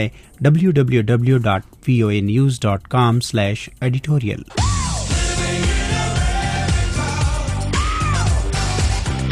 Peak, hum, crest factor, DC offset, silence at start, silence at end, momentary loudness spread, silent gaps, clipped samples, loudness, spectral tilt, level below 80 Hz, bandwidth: -2 dBFS; none; 14 dB; under 0.1%; 0 s; 0 s; 5 LU; none; under 0.1%; -18 LUFS; -5.5 dB/octave; -26 dBFS; 13 kHz